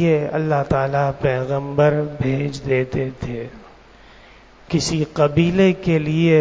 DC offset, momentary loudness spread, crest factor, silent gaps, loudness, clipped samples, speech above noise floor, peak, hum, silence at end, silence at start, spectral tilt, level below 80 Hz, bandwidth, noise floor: under 0.1%; 9 LU; 16 dB; none; -19 LUFS; under 0.1%; 28 dB; -4 dBFS; none; 0 s; 0 s; -6.5 dB/octave; -42 dBFS; 8 kHz; -46 dBFS